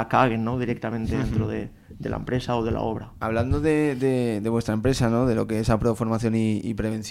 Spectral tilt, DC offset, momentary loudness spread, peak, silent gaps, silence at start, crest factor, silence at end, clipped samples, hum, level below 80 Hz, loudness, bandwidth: -7 dB/octave; under 0.1%; 8 LU; -6 dBFS; none; 0 s; 18 dB; 0 s; under 0.1%; none; -40 dBFS; -24 LUFS; 14.5 kHz